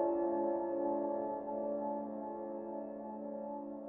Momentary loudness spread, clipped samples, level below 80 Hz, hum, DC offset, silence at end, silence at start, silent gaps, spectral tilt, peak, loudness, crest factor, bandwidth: 9 LU; under 0.1%; -74 dBFS; none; under 0.1%; 0 s; 0 s; none; -10 dB/octave; -22 dBFS; -39 LUFS; 16 dB; 2.8 kHz